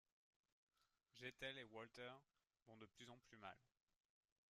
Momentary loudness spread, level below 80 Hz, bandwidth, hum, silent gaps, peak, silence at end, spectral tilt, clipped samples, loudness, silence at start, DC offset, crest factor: 12 LU; -88 dBFS; 13 kHz; none; 2.62-2.66 s; -40 dBFS; 0.85 s; -4 dB/octave; under 0.1%; -59 LUFS; 0.8 s; under 0.1%; 22 dB